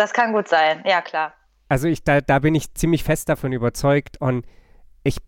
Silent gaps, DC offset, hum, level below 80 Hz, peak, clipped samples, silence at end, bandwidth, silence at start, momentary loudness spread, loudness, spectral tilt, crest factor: none; under 0.1%; none; -38 dBFS; -4 dBFS; under 0.1%; 0.05 s; 17 kHz; 0 s; 8 LU; -20 LUFS; -5.5 dB/octave; 16 dB